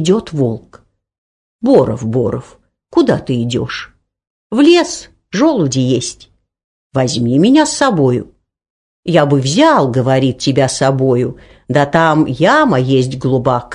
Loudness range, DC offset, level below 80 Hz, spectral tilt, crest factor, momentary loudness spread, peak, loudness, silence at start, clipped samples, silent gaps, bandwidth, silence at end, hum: 4 LU; under 0.1%; -46 dBFS; -5.5 dB/octave; 14 dB; 11 LU; 0 dBFS; -13 LUFS; 0 s; under 0.1%; 1.18-1.59 s, 4.30-4.50 s, 6.64-6.90 s, 8.70-9.03 s; 10.5 kHz; 0 s; none